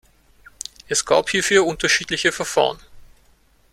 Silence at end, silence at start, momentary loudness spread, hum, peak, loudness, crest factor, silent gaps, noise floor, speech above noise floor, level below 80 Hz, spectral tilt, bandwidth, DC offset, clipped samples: 0.7 s; 0.9 s; 18 LU; none; -2 dBFS; -19 LUFS; 20 dB; none; -56 dBFS; 37 dB; -50 dBFS; -2 dB/octave; 15.5 kHz; under 0.1%; under 0.1%